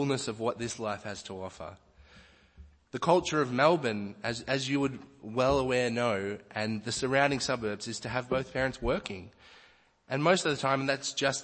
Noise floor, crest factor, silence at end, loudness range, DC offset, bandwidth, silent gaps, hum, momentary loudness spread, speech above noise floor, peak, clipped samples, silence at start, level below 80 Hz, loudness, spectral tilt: -61 dBFS; 22 dB; 0 s; 3 LU; under 0.1%; 8.8 kHz; none; none; 14 LU; 31 dB; -10 dBFS; under 0.1%; 0 s; -54 dBFS; -30 LUFS; -4.5 dB/octave